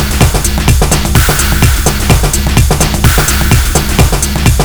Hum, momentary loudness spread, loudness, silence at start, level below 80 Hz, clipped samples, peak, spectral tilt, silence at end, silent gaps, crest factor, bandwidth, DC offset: none; 2 LU; -9 LUFS; 0 s; -12 dBFS; 1%; 0 dBFS; -4 dB/octave; 0 s; none; 8 dB; over 20 kHz; under 0.1%